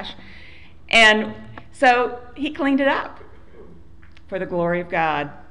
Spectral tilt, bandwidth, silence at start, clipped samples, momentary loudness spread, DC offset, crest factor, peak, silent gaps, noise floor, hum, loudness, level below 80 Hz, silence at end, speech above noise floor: -4 dB/octave; 11.5 kHz; 0 s; under 0.1%; 19 LU; 0.9%; 18 dB; -4 dBFS; none; -47 dBFS; none; -19 LUFS; -48 dBFS; 0.1 s; 28 dB